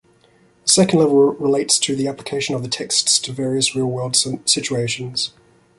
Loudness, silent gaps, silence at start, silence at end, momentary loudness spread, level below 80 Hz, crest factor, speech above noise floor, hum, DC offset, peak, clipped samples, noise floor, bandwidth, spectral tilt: -17 LUFS; none; 0.65 s; 0.5 s; 9 LU; -58 dBFS; 20 dB; 36 dB; none; under 0.1%; 0 dBFS; under 0.1%; -55 dBFS; 11.5 kHz; -3 dB/octave